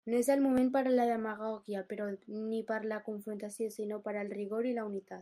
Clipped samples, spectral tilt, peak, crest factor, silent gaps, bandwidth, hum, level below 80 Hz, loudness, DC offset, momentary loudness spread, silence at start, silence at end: under 0.1%; -5.5 dB/octave; -18 dBFS; 16 dB; none; 15.5 kHz; none; -76 dBFS; -34 LUFS; under 0.1%; 11 LU; 0.05 s; 0 s